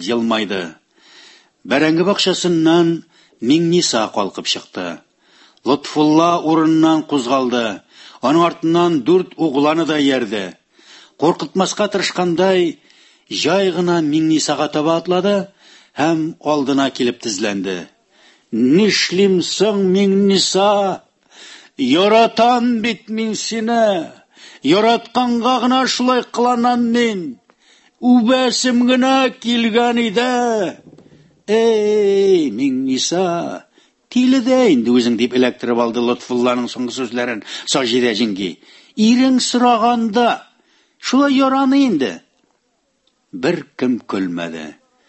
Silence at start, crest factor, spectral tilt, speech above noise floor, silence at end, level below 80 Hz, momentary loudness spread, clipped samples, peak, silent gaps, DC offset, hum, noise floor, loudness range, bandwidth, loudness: 0 s; 16 dB; -4.5 dB/octave; 50 dB; 0.35 s; -62 dBFS; 11 LU; under 0.1%; -2 dBFS; none; under 0.1%; none; -65 dBFS; 3 LU; 8.6 kHz; -16 LUFS